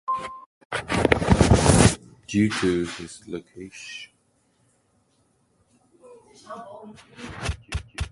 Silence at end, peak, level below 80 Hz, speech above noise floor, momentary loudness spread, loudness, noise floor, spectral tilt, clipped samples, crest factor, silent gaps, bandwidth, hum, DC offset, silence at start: 0.05 s; 0 dBFS; -36 dBFS; 38 dB; 24 LU; -22 LUFS; -66 dBFS; -5 dB/octave; under 0.1%; 24 dB; 0.46-0.70 s; 11.5 kHz; none; under 0.1%; 0.1 s